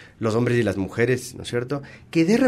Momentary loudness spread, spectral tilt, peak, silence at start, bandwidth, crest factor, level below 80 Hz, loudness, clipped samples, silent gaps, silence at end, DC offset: 8 LU; -6.5 dB/octave; -6 dBFS; 0 s; 15 kHz; 16 dB; -54 dBFS; -24 LUFS; under 0.1%; none; 0 s; under 0.1%